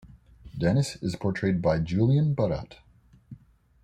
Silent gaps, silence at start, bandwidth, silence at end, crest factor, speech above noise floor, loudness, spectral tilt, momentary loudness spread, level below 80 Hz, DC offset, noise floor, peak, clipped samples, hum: none; 0.1 s; 10.5 kHz; 0.45 s; 16 dB; 28 dB; -26 LUFS; -7.5 dB/octave; 10 LU; -50 dBFS; under 0.1%; -53 dBFS; -10 dBFS; under 0.1%; none